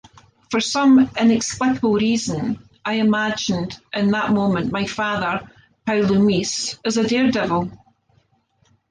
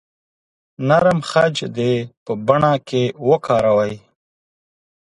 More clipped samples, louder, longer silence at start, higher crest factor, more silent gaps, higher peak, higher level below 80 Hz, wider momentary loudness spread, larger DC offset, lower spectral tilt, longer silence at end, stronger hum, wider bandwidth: neither; about the same, -20 LUFS vs -18 LUFS; second, 0.5 s vs 0.8 s; about the same, 14 dB vs 18 dB; second, none vs 2.17-2.26 s; second, -6 dBFS vs 0 dBFS; about the same, -54 dBFS vs -54 dBFS; about the same, 9 LU vs 9 LU; neither; second, -4.5 dB/octave vs -6.5 dB/octave; about the same, 1.15 s vs 1.05 s; neither; second, 10 kHz vs 11.5 kHz